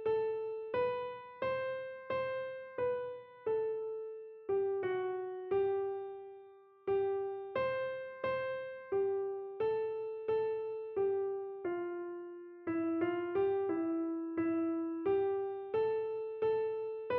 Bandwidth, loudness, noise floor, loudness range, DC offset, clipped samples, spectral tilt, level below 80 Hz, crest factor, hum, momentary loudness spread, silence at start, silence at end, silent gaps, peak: 4.5 kHz; -37 LUFS; -58 dBFS; 3 LU; under 0.1%; under 0.1%; -5 dB/octave; -74 dBFS; 14 dB; none; 9 LU; 0 s; 0 s; none; -24 dBFS